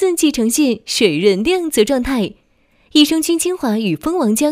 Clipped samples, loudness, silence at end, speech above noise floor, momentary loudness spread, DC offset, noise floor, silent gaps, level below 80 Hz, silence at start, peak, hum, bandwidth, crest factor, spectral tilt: under 0.1%; -15 LUFS; 0 s; 41 dB; 5 LU; under 0.1%; -56 dBFS; none; -44 dBFS; 0 s; 0 dBFS; none; 16 kHz; 16 dB; -3.5 dB/octave